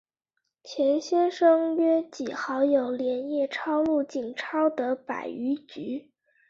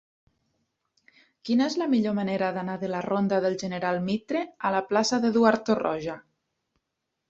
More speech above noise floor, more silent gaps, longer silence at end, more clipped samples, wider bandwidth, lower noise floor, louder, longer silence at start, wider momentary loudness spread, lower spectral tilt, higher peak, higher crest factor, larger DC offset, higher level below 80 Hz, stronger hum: about the same, 55 dB vs 57 dB; neither; second, 0.5 s vs 1.1 s; neither; about the same, 7.6 kHz vs 8 kHz; about the same, -81 dBFS vs -82 dBFS; about the same, -26 LUFS vs -26 LUFS; second, 0.65 s vs 1.45 s; first, 12 LU vs 9 LU; about the same, -4.5 dB/octave vs -5.5 dB/octave; second, -10 dBFS vs -6 dBFS; about the same, 16 dB vs 20 dB; neither; about the same, -72 dBFS vs -68 dBFS; neither